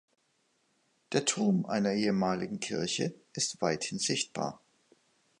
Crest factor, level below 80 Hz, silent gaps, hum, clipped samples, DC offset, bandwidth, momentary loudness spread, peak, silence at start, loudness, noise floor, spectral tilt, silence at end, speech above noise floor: 20 dB; -70 dBFS; none; none; under 0.1%; under 0.1%; 11 kHz; 6 LU; -14 dBFS; 1.1 s; -31 LUFS; -74 dBFS; -4 dB/octave; 0.85 s; 43 dB